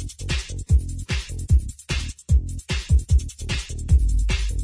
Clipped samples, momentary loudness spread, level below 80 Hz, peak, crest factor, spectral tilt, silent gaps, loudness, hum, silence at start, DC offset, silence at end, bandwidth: under 0.1%; 8 LU; -22 dBFS; -8 dBFS; 14 dB; -4.5 dB/octave; none; -24 LUFS; none; 0 s; under 0.1%; 0 s; 11 kHz